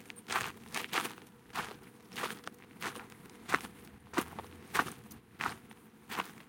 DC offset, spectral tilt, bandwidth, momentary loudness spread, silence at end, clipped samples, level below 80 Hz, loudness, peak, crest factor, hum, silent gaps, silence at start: under 0.1%; -2.5 dB/octave; 17 kHz; 17 LU; 0 s; under 0.1%; -70 dBFS; -39 LUFS; -8 dBFS; 32 dB; none; none; 0 s